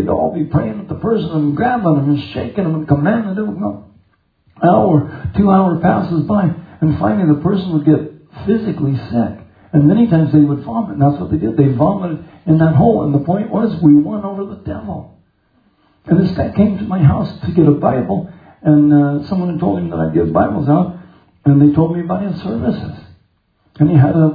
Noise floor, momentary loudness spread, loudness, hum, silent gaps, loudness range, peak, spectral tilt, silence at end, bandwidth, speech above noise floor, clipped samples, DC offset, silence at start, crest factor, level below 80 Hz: -59 dBFS; 12 LU; -15 LUFS; none; none; 3 LU; 0 dBFS; -12 dB/octave; 0 s; 5 kHz; 45 dB; under 0.1%; under 0.1%; 0 s; 14 dB; -42 dBFS